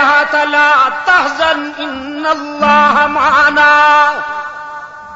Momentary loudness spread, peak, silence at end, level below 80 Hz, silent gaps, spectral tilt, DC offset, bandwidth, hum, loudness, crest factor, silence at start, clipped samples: 15 LU; 0 dBFS; 0 s; -48 dBFS; none; 0.5 dB/octave; under 0.1%; 8 kHz; none; -10 LUFS; 12 dB; 0 s; under 0.1%